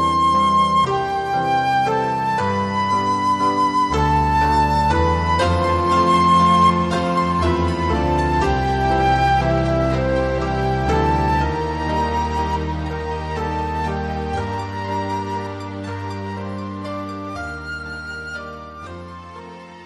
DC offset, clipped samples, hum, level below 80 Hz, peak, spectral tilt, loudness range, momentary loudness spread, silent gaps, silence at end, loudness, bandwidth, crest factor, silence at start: under 0.1%; under 0.1%; none; -30 dBFS; -4 dBFS; -6 dB/octave; 11 LU; 13 LU; none; 0 s; -19 LUFS; 12 kHz; 16 dB; 0 s